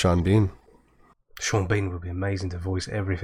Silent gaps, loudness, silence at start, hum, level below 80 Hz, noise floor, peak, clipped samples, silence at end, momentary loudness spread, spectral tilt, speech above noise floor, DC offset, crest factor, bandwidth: none; -26 LUFS; 0 s; none; -42 dBFS; -59 dBFS; -10 dBFS; under 0.1%; 0 s; 9 LU; -6 dB/octave; 35 dB; under 0.1%; 16 dB; 11.5 kHz